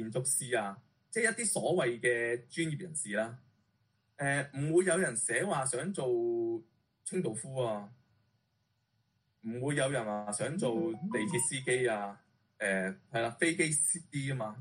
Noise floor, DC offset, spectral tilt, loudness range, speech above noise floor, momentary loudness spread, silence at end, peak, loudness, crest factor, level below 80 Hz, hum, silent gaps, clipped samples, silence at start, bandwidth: -78 dBFS; under 0.1%; -4 dB/octave; 5 LU; 45 dB; 8 LU; 0 s; -14 dBFS; -33 LUFS; 20 dB; -74 dBFS; none; none; under 0.1%; 0 s; 11.5 kHz